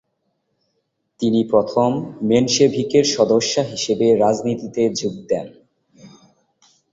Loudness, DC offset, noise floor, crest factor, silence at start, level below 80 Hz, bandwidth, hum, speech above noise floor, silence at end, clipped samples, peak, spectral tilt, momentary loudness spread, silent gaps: -18 LUFS; under 0.1%; -71 dBFS; 18 dB; 1.2 s; -58 dBFS; 8 kHz; none; 54 dB; 0.85 s; under 0.1%; -2 dBFS; -4.5 dB/octave; 9 LU; none